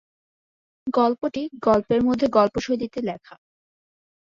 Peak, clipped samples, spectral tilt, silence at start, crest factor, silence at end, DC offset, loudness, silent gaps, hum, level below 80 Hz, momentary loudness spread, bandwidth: -6 dBFS; under 0.1%; -6.5 dB/octave; 0.85 s; 18 dB; 0.95 s; under 0.1%; -22 LUFS; none; none; -54 dBFS; 11 LU; 7.4 kHz